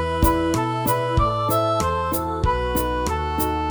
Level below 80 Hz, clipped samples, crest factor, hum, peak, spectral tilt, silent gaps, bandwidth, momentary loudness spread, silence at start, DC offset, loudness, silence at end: -30 dBFS; under 0.1%; 16 dB; none; -6 dBFS; -5.5 dB/octave; none; over 20 kHz; 3 LU; 0 s; under 0.1%; -22 LUFS; 0 s